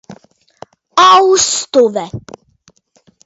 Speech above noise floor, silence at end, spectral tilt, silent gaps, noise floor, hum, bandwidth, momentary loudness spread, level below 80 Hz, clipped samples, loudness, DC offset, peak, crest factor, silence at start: 43 dB; 1.05 s; -2 dB/octave; none; -54 dBFS; none; 8 kHz; 18 LU; -52 dBFS; under 0.1%; -10 LUFS; under 0.1%; 0 dBFS; 14 dB; 0.1 s